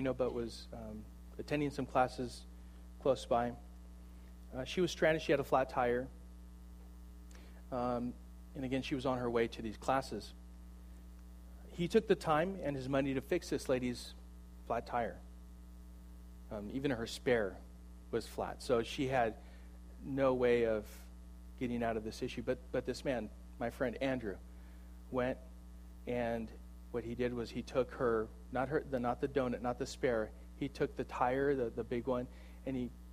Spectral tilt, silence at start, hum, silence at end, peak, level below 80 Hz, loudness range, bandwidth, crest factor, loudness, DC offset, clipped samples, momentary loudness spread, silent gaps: -6 dB/octave; 0 s; none; 0 s; -18 dBFS; -52 dBFS; 5 LU; 15.5 kHz; 20 dB; -37 LUFS; under 0.1%; under 0.1%; 22 LU; none